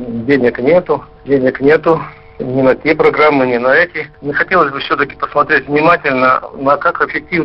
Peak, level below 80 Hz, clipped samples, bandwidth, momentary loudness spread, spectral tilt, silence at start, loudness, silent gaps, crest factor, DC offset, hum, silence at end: 0 dBFS; -44 dBFS; under 0.1%; 5.8 kHz; 7 LU; -8 dB/octave; 0 s; -12 LUFS; none; 12 dB; 0.2%; none; 0 s